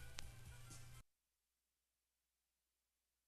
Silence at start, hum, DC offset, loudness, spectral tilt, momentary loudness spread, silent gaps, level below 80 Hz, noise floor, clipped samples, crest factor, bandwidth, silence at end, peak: 0 s; none; under 0.1%; -59 LUFS; -2.5 dB/octave; 8 LU; none; -66 dBFS; under -90 dBFS; under 0.1%; 36 dB; 14 kHz; 2.2 s; -24 dBFS